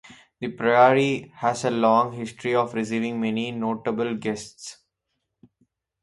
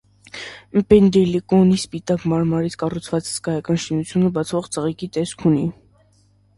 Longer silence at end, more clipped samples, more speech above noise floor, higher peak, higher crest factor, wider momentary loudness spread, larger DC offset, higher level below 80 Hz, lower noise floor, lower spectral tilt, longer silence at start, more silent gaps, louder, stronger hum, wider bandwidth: first, 1.3 s vs 0.85 s; neither; first, 56 dB vs 38 dB; second, -4 dBFS vs 0 dBFS; about the same, 22 dB vs 18 dB; first, 16 LU vs 10 LU; neither; second, -66 dBFS vs -46 dBFS; first, -79 dBFS vs -57 dBFS; about the same, -5.5 dB/octave vs -6.5 dB/octave; second, 0.05 s vs 0.35 s; neither; second, -23 LUFS vs -19 LUFS; neither; about the same, 11.5 kHz vs 11.5 kHz